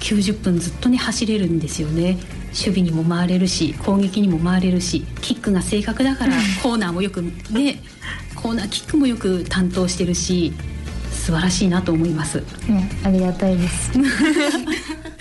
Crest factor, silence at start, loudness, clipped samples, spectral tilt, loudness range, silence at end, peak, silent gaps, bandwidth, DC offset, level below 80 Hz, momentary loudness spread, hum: 12 dB; 0 s; -20 LUFS; under 0.1%; -5 dB/octave; 2 LU; 0 s; -8 dBFS; none; 12 kHz; under 0.1%; -34 dBFS; 8 LU; none